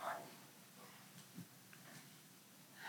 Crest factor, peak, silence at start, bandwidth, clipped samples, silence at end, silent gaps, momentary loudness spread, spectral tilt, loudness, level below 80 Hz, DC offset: 24 dB; -32 dBFS; 0 s; 19 kHz; under 0.1%; 0 s; none; 9 LU; -3 dB/octave; -57 LUFS; under -90 dBFS; under 0.1%